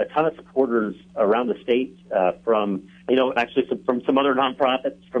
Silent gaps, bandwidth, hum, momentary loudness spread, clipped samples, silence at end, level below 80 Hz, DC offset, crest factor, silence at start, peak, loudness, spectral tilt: none; 7 kHz; none; 6 LU; under 0.1%; 0 s; -62 dBFS; under 0.1%; 16 dB; 0 s; -6 dBFS; -22 LUFS; -7 dB/octave